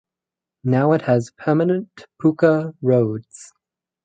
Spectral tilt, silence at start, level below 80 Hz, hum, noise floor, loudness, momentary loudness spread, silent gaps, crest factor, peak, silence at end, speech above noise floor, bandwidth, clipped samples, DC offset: -8.5 dB/octave; 0.65 s; -64 dBFS; none; -87 dBFS; -19 LUFS; 9 LU; none; 18 dB; -2 dBFS; 0.6 s; 69 dB; 9.2 kHz; under 0.1%; under 0.1%